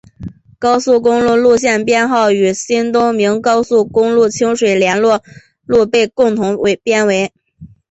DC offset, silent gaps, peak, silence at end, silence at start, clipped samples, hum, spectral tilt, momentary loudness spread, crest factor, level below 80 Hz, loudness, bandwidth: under 0.1%; none; 0 dBFS; 0.25 s; 0.2 s; under 0.1%; none; -4.5 dB/octave; 5 LU; 12 dB; -48 dBFS; -13 LUFS; 8.2 kHz